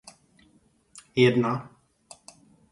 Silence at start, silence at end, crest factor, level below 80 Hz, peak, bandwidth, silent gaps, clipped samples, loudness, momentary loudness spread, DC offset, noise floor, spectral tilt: 1.15 s; 1.1 s; 22 dB; -66 dBFS; -6 dBFS; 11.5 kHz; none; under 0.1%; -24 LUFS; 27 LU; under 0.1%; -63 dBFS; -6.5 dB/octave